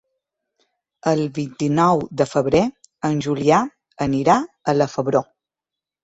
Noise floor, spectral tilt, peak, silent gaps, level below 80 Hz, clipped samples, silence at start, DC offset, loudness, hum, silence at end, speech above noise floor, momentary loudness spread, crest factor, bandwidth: -87 dBFS; -6.5 dB/octave; -2 dBFS; none; -54 dBFS; under 0.1%; 1.05 s; under 0.1%; -20 LUFS; none; 0.8 s; 69 dB; 8 LU; 18 dB; 8.2 kHz